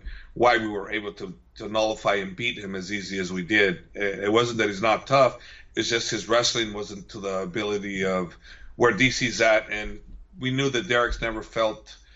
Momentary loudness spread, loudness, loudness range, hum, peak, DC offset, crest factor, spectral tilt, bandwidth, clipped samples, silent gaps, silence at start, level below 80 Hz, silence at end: 13 LU; -24 LUFS; 3 LU; none; -6 dBFS; under 0.1%; 18 dB; -4 dB/octave; 8.2 kHz; under 0.1%; none; 0.05 s; -46 dBFS; 0.2 s